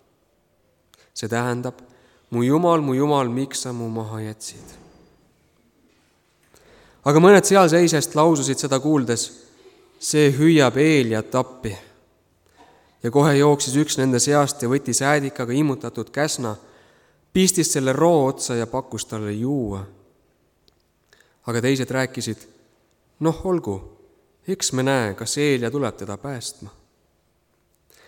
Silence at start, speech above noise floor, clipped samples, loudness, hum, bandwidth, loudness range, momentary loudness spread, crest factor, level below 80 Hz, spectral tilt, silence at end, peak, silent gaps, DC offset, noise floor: 1.15 s; 45 dB; under 0.1%; -20 LUFS; none; 18.5 kHz; 10 LU; 16 LU; 20 dB; -56 dBFS; -5 dB/octave; 1.4 s; -2 dBFS; none; under 0.1%; -65 dBFS